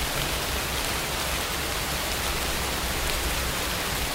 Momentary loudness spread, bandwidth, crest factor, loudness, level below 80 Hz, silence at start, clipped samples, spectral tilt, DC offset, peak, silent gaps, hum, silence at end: 1 LU; 16.5 kHz; 20 dB; -26 LUFS; -36 dBFS; 0 s; under 0.1%; -2.5 dB/octave; under 0.1%; -8 dBFS; none; none; 0 s